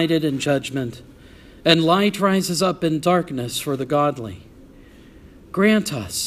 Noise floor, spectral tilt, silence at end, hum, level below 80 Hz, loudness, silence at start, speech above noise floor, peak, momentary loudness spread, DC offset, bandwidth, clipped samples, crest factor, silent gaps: -45 dBFS; -4.5 dB/octave; 0 s; none; -52 dBFS; -20 LUFS; 0 s; 26 dB; 0 dBFS; 12 LU; under 0.1%; 15.5 kHz; under 0.1%; 22 dB; none